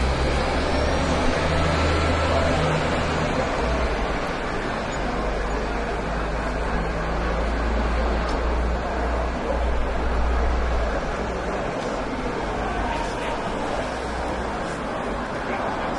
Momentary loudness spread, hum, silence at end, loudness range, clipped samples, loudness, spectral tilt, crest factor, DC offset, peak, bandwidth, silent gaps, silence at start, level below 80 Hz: 6 LU; none; 0 s; 5 LU; under 0.1%; -25 LUFS; -5.5 dB/octave; 14 dB; under 0.1%; -8 dBFS; 11 kHz; none; 0 s; -28 dBFS